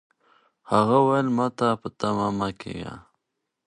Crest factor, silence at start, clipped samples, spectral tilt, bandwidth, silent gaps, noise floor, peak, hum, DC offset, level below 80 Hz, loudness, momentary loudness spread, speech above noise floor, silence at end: 22 dB; 0.7 s; under 0.1%; -7 dB/octave; 10.5 kHz; none; -81 dBFS; -4 dBFS; none; under 0.1%; -58 dBFS; -23 LUFS; 16 LU; 58 dB; 0.65 s